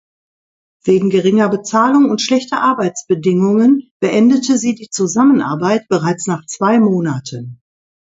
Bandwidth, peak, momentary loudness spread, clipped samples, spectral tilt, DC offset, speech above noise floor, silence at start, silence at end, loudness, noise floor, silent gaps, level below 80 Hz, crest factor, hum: 8 kHz; 0 dBFS; 8 LU; under 0.1%; -5.5 dB/octave; under 0.1%; over 77 dB; 0.85 s; 0.6 s; -14 LUFS; under -90 dBFS; 3.91-4.00 s; -60 dBFS; 14 dB; none